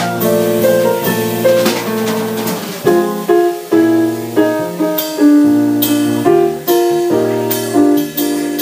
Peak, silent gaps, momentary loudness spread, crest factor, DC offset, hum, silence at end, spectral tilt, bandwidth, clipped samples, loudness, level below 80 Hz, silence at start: 0 dBFS; none; 5 LU; 12 dB; under 0.1%; none; 0 s; -5 dB/octave; 16 kHz; under 0.1%; -13 LUFS; -56 dBFS; 0 s